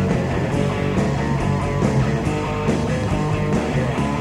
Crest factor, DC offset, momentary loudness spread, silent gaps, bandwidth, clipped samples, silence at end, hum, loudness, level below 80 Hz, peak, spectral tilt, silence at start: 16 dB; under 0.1%; 2 LU; none; 11.5 kHz; under 0.1%; 0 s; none; -21 LUFS; -32 dBFS; -4 dBFS; -7 dB/octave; 0 s